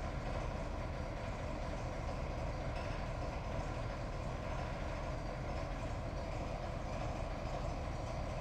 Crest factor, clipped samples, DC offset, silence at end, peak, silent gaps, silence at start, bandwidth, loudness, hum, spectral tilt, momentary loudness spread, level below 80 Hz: 14 dB; under 0.1%; under 0.1%; 0 s; -26 dBFS; none; 0 s; 9.6 kHz; -42 LUFS; none; -6.5 dB/octave; 1 LU; -44 dBFS